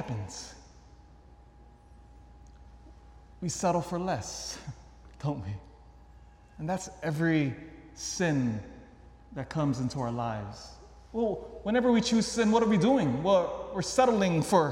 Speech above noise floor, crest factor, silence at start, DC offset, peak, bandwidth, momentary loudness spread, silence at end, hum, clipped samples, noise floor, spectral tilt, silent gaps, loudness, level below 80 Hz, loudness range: 26 dB; 22 dB; 0 s; under 0.1%; -10 dBFS; 15 kHz; 18 LU; 0 s; none; under 0.1%; -55 dBFS; -5.5 dB/octave; none; -29 LUFS; -54 dBFS; 11 LU